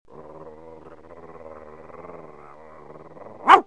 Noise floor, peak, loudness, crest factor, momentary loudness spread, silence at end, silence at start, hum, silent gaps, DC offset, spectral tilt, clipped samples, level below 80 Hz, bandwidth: -45 dBFS; 0 dBFS; -18 LUFS; 24 dB; 10 LU; 0.05 s; 3.45 s; none; none; 0.3%; -3.5 dB/octave; under 0.1%; -62 dBFS; 10 kHz